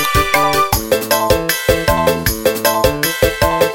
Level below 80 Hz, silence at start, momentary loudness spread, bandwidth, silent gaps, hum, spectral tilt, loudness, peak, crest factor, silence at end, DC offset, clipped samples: -28 dBFS; 0 s; 2 LU; 17 kHz; none; none; -3.5 dB/octave; -14 LUFS; 0 dBFS; 14 dB; 0 s; under 0.1%; under 0.1%